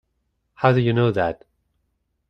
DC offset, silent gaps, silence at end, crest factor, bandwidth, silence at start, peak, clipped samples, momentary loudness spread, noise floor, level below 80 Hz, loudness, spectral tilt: under 0.1%; none; 0.95 s; 20 dB; 5.8 kHz; 0.6 s; -2 dBFS; under 0.1%; 8 LU; -72 dBFS; -54 dBFS; -20 LUFS; -9 dB/octave